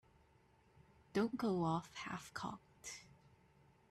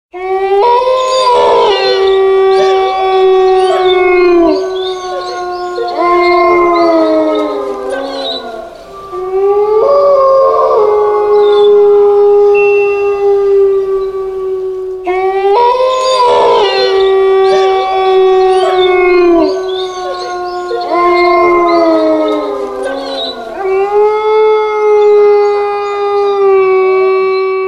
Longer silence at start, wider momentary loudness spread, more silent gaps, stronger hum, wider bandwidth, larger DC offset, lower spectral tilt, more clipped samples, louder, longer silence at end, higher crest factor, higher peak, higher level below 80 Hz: first, 1.15 s vs 0.15 s; first, 14 LU vs 11 LU; neither; neither; first, 14 kHz vs 10 kHz; neither; first, -5.5 dB/octave vs -4 dB/octave; neither; second, -42 LUFS vs -9 LUFS; first, 0.85 s vs 0 s; first, 18 dB vs 8 dB; second, -26 dBFS vs 0 dBFS; second, -74 dBFS vs -44 dBFS